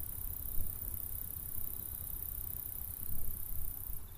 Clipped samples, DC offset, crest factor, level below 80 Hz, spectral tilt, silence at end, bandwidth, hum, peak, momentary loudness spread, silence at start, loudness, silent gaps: under 0.1%; under 0.1%; 16 dB; -46 dBFS; -4 dB/octave; 0 s; 15.5 kHz; none; -20 dBFS; 2 LU; 0 s; -40 LUFS; none